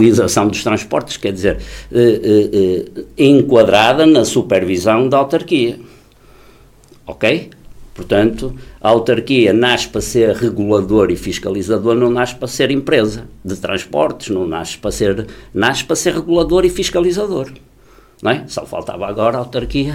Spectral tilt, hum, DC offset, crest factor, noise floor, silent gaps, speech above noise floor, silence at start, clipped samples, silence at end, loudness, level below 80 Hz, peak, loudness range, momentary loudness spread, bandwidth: -5 dB/octave; none; under 0.1%; 14 dB; -45 dBFS; none; 31 dB; 0 s; under 0.1%; 0 s; -14 LUFS; -38 dBFS; 0 dBFS; 6 LU; 12 LU; 16 kHz